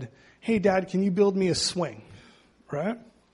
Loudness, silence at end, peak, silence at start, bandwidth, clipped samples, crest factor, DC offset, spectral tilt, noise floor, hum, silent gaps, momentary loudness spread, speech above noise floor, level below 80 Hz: -26 LUFS; 0.3 s; -10 dBFS; 0 s; 11.5 kHz; under 0.1%; 18 dB; under 0.1%; -5 dB/octave; -56 dBFS; none; none; 15 LU; 30 dB; -60 dBFS